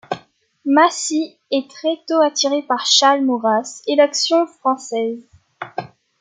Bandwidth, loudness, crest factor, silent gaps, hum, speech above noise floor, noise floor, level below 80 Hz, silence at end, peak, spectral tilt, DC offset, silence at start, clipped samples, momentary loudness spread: 9.6 kHz; -17 LUFS; 18 dB; none; none; 31 dB; -49 dBFS; -72 dBFS; 0.35 s; 0 dBFS; -2 dB/octave; under 0.1%; 0.1 s; under 0.1%; 16 LU